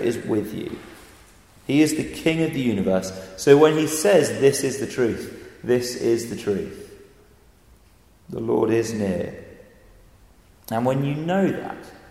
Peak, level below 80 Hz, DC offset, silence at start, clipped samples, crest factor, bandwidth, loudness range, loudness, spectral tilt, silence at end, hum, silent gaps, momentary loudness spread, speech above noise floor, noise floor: -2 dBFS; -54 dBFS; under 0.1%; 0 s; under 0.1%; 22 dB; 16 kHz; 8 LU; -22 LUFS; -5.5 dB/octave; 0.15 s; none; none; 17 LU; 33 dB; -54 dBFS